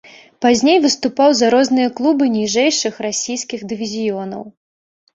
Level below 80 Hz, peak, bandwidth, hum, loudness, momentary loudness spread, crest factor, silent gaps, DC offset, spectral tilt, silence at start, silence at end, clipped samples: -58 dBFS; 0 dBFS; 8 kHz; none; -16 LUFS; 12 LU; 16 dB; none; under 0.1%; -3 dB/octave; 0.4 s; 0.65 s; under 0.1%